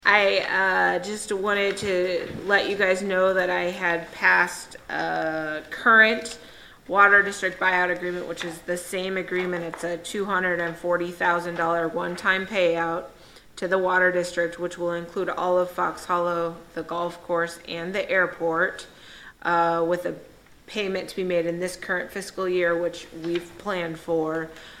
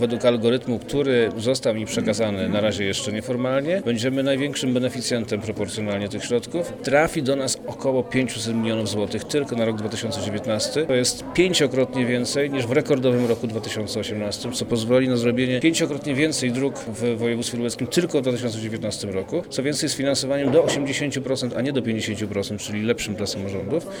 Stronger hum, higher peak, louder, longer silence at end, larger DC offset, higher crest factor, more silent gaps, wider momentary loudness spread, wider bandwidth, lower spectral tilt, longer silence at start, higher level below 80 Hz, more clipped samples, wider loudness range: neither; about the same, -2 dBFS vs -4 dBFS; about the same, -24 LUFS vs -23 LUFS; about the same, 0 s vs 0 s; neither; about the same, 22 dB vs 18 dB; neither; first, 13 LU vs 7 LU; second, 16 kHz vs 19 kHz; about the same, -4 dB/octave vs -4.5 dB/octave; about the same, 0.05 s vs 0 s; about the same, -58 dBFS vs -54 dBFS; neither; first, 7 LU vs 2 LU